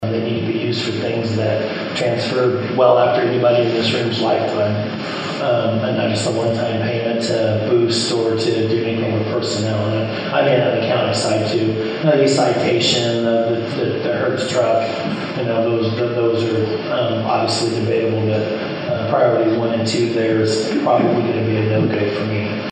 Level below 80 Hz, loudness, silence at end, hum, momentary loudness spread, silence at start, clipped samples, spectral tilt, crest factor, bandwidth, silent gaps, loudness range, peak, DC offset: -64 dBFS; -18 LUFS; 0 s; none; 5 LU; 0 s; under 0.1%; -5.5 dB/octave; 16 dB; 9.6 kHz; none; 2 LU; -2 dBFS; under 0.1%